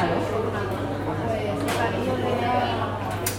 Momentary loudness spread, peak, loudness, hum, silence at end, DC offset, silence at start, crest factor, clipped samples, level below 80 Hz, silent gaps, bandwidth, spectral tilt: 4 LU; -6 dBFS; -26 LUFS; none; 0 s; under 0.1%; 0 s; 18 dB; under 0.1%; -46 dBFS; none; 16.5 kHz; -5.5 dB/octave